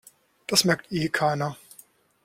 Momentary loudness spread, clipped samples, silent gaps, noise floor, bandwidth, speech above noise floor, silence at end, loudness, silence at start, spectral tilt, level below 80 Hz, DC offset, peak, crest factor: 17 LU; under 0.1%; none; -55 dBFS; 16.5 kHz; 31 dB; 0.7 s; -24 LUFS; 0.5 s; -3.5 dB/octave; -62 dBFS; under 0.1%; -4 dBFS; 22 dB